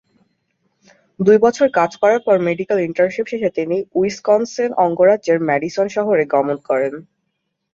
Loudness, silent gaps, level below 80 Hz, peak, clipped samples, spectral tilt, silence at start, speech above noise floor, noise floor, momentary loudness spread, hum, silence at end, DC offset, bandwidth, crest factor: -17 LUFS; none; -60 dBFS; -2 dBFS; under 0.1%; -6 dB/octave; 1.2 s; 57 dB; -73 dBFS; 7 LU; none; 0.7 s; under 0.1%; 7.6 kHz; 16 dB